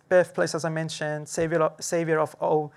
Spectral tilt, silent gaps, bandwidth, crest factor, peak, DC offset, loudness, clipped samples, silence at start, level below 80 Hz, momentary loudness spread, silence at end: -5 dB/octave; none; 14 kHz; 16 dB; -10 dBFS; under 0.1%; -26 LUFS; under 0.1%; 0.1 s; -64 dBFS; 7 LU; 0.1 s